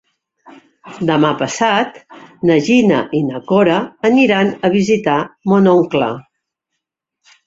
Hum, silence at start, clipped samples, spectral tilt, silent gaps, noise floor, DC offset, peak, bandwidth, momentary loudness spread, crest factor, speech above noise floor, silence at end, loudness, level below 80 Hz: none; 0.85 s; under 0.1%; -6 dB/octave; none; -77 dBFS; under 0.1%; -2 dBFS; 7.8 kHz; 8 LU; 14 dB; 63 dB; 1.25 s; -14 LUFS; -56 dBFS